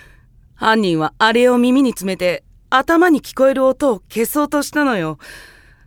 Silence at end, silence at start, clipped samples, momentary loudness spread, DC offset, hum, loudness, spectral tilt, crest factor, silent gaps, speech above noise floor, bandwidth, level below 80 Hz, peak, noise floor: 0.45 s; 0.6 s; under 0.1%; 8 LU; under 0.1%; none; -16 LUFS; -4.5 dB/octave; 16 dB; none; 32 dB; 18.5 kHz; -48 dBFS; 0 dBFS; -48 dBFS